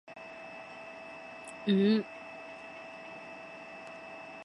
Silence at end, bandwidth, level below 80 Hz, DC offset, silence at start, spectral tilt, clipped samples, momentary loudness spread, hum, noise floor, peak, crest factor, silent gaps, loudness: 0 s; 11 kHz; -78 dBFS; under 0.1%; 0.1 s; -6.5 dB/octave; under 0.1%; 18 LU; none; -47 dBFS; -16 dBFS; 20 dB; none; -36 LUFS